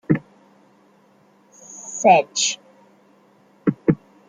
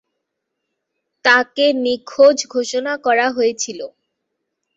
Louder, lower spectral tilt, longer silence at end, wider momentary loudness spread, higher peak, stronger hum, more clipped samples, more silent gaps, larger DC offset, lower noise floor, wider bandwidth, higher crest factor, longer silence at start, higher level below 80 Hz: second, -20 LUFS vs -16 LUFS; first, -4 dB/octave vs -1 dB/octave; second, 0.35 s vs 0.9 s; first, 18 LU vs 12 LU; about the same, -2 dBFS vs 0 dBFS; neither; neither; neither; neither; second, -56 dBFS vs -77 dBFS; first, 9.6 kHz vs 8 kHz; about the same, 22 dB vs 18 dB; second, 0.1 s vs 1.25 s; first, -60 dBFS vs -68 dBFS